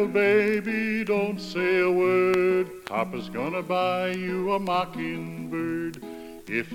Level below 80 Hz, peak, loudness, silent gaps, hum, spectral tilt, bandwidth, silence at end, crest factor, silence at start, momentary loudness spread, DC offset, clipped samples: -60 dBFS; -8 dBFS; -25 LUFS; none; none; -6.5 dB/octave; 16 kHz; 0 s; 16 dB; 0 s; 11 LU; under 0.1%; under 0.1%